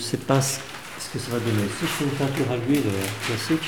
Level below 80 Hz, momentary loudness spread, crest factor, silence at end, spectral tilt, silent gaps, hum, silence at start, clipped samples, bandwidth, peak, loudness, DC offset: -56 dBFS; 9 LU; 20 dB; 0 s; -4.5 dB/octave; none; none; 0 s; under 0.1%; over 20 kHz; -4 dBFS; -25 LUFS; 0.4%